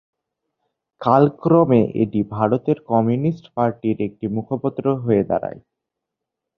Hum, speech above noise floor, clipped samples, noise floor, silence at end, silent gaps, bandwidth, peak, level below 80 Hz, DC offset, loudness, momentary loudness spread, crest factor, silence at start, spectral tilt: none; 64 dB; under 0.1%; -83 dBFS; 1 s; none; 6 kHz; -2 dBFS; -56 dBFS; under 0.1%; -19 LUFS; 9 LU; 18 dB; 1 s; -11 dB/octave